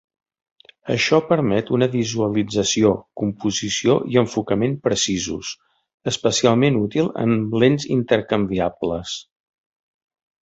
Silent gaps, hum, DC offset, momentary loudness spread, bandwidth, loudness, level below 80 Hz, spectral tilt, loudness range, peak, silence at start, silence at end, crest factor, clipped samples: 5.94-5.98 s; none; under 0.1%; 9 LU; 8 kHz; -20 LUFS; -50 dBFS; -5 dB/octave; 2 LU; -2 dBFS; 0.85 s; 1.2 s; 18 dB; under 0.1%